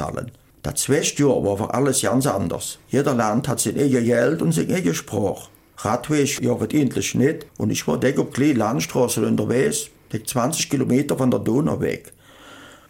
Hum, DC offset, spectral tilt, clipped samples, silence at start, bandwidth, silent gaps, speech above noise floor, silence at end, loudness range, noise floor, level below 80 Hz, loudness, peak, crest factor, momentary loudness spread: none; under 0.1%; -5 dB/octave; under 0.1%; 0 s; 17 kHz; none; 24 dB; 0.15 s; 2 LU; -45 dBFS; -52 dBFS; -21 LUFS; -6 dBFS; 16 dB; 8 LU